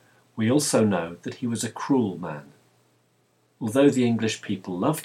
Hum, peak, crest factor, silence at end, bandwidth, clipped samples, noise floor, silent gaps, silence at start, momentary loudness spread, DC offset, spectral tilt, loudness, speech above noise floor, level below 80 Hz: none; -8 dBFS; 18 dB; 0 s; 16 kHz; under 0.1%; -66 dBFS; none; 0.35 s; 14 LU; under 0.1%; -5 dB/octave; -24 LUFS; 42 dB; -70 dBFS